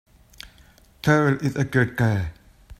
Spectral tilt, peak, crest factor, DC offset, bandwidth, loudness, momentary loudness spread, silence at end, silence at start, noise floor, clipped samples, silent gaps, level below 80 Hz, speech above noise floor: -7 dB/octave; -4 dBFS; 20 dB; under 0.1%; 15.5 kHz; -22 LUFS; 24 LU; 0.05 s; 1.05 s; -53 dBFS; under 0.1%; none; -48 dBFS; 32 dB